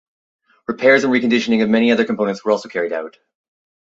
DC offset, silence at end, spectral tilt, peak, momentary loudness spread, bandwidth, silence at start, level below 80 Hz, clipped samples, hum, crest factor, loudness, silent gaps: under 0.1%; 0.8 s; -5 dB/octave; -2 dBFS; 14 LU; 7.8 kHz; 0.7 s; -62 dBFS; under 0.1%; none; 16 dB; -16 LUFS; none